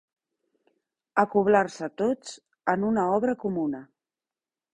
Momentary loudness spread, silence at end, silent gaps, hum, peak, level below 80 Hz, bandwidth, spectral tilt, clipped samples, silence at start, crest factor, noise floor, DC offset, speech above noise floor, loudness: 10 LU; 0.9 s; none; none; -6 dBFS; -66 dBFS; 10 kHz; -6.5 dB/octave; under 0.1%; 1.15 s; 22 dB; under -90 dBFS; under 0.1%; over 65 dB; -26 LUFS